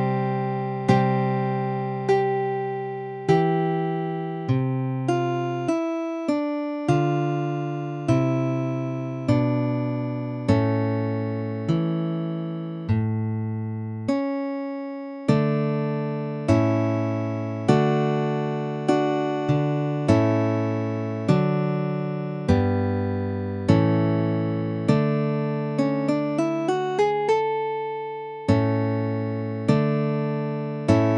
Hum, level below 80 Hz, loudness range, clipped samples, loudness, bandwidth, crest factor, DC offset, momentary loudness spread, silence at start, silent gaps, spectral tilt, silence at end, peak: none; -54 dBFS; 3 LU; under 0.1%; -24 LUFS; 10.5 kHz; 20 dB; under 0.1%; 7 LU; 0 s; none; -8.5 dB/octave; 0 s; -4 dBFS